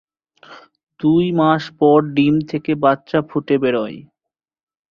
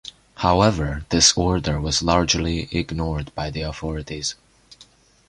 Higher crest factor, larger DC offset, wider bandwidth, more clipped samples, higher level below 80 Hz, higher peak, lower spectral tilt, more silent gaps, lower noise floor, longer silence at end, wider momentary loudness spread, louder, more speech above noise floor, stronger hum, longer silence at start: about the same, 18 dB vs 20 dB; neither; second, 6.8 kHz vs 11.5 kHz; neither; second, -56 dBFS vs -34 dBFS; about the same, 0 dBFS vs -2 dBFS; first, -8.5 dB/octave vs -3.5 dB/octave; neither; first, -84 dBFS vs -53 dBFS; first, 0.95 s vs 0.45 s; second, 8 LU vs 13 LU; first, -17 LUFS vs -21 LUFS; first, 68 dB vs 32 dB; neither; first, 0.5 s vs 0.05 s